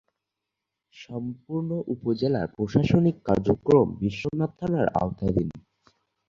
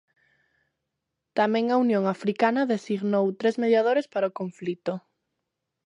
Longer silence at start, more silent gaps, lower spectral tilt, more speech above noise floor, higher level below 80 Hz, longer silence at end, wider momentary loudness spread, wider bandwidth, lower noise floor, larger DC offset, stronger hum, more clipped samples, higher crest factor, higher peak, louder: second, 0.95 s vs 1.35 s; neither; first, -9 dB/octave vs -7 dB/octave; about the same, 60 dB vs 59 dB; first, -48 dBFS vs -80 dBFS; second, 0.7 s vs 0.85 s; about the same, 12 LU vs 10 LU; second, 7.4 kHz vs 10 kHz; about the same, -85 dBFS vs -83 dBFS; neither; neither; neither; about the same, 20 dB vs 18 dB; about the same, -6 dBFS vs -8 dBFS; about the same, -25 LUFS vs -25 LUFS